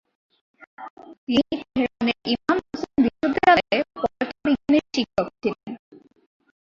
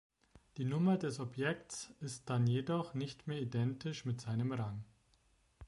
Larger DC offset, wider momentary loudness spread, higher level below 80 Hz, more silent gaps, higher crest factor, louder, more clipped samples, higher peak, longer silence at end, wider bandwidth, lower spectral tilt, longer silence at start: neither; first, 21 LU vs 12 LU; first, -54 dBFS vs -68 dBFS; first, 0.90-0.97 s, 1.18-1.27 s vs none; about the same, 22 dB vs 18 dB; first, -23 LUFS vs -38 LUFS; neither; first, -2 dBFS vs -22 dBFS; first, 0.9 s vs 0 s; second, 7.6 kHz vs 11.5 kHz; second, -5 dB/octave vs -6.5 dB/octave; first, 0.8 s vs 0.55 s